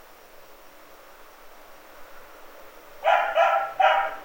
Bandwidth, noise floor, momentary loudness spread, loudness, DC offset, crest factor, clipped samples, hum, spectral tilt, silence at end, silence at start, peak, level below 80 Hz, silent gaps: 16.5 kHz; -48 dBFS; 26 LU; -22 LUFS; under 0.1%; 20 dB; under 0.1%; none; -1 dB/octave; 0 s; 0.4 s; -6 dBFS; -58 dBFS; none